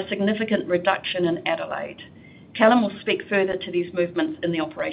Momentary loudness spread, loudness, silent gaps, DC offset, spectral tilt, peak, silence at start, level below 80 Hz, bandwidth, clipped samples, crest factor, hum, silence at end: 11 LU; -23 LUFS; none; under 0.1%; -10 dB/octave; -4 dBFS; 0 s; -62 dBFS; 5.2 kHz; under 0.1%; 20 dB; none; 0 s